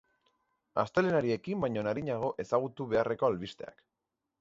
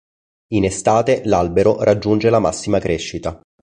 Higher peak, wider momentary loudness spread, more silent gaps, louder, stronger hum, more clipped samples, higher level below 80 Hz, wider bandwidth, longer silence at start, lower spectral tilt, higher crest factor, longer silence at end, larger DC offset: second, -12 dBFS vs -2 dBFS; about the same, 10 LU vs 8 LU; neither; second, -32 LUFS vs -17 LUFS; neither; neither; second, -64 dBFS vs -40 dBFS; second, 7.8 kHz vs 10.5 kHz; first, 0.75 s vs 0.5 s; first, -7 dB/octave vs -5.5 dB/octave; about the same, 20 dB vs 16 dB; first, 0.7 s vs 0.25 s; neither